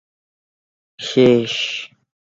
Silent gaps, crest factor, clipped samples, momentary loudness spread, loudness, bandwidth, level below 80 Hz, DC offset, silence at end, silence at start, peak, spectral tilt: none; 18 dB; under 0.1%; 16 LU; -17 LUFS; 7.8 kHz; -58 dBFS; under 0.1%; 0.45 s; 1 s; -2 dBFS; -5 dB/octave